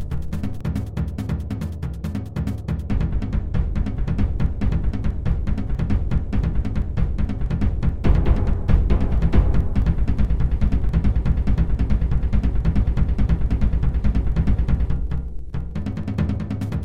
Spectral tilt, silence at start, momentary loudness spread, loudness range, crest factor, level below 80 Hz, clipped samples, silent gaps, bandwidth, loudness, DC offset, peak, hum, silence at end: -9 dB/octave; 0 s; 7 LU; 4 LU; 18 dB; -22 dBFS; under 0.1%; none; 5.8 kHz; -23 LUFS; 3%; -2 dBFS; none; 0 s